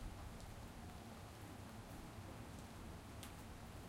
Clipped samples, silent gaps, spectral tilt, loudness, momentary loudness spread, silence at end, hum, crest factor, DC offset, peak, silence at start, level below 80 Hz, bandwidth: under 0.1%; none; -5 dB/octave; -55 LUFS; 1 LU; 0 s; none; 18 dB; under 0.1%; -36 dBFS; 0 s; -60 dBFS; 16 kHz